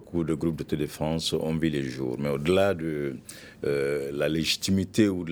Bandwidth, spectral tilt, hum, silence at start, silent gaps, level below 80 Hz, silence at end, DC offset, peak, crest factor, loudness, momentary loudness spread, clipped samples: over 20 kHz; -5.5 dB/octave; none; 0 s; none; -52 dBFS; 0 s; under 0.1%; -10 dBFS; 18 dB; -27 LUFS; 8 LU; under 0.1%